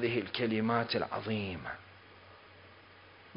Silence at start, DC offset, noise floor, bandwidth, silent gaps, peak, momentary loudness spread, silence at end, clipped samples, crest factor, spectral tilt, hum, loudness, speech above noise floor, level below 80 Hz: 0 s; under 0.1%; -57 dBFS; 5.2 kHz; none; -16 dBFS; 24 LU; 0 s; under 0.1%; 22 dB; -4 dB/octave; none; -34 LUFS; 23 dB; -62 dBFS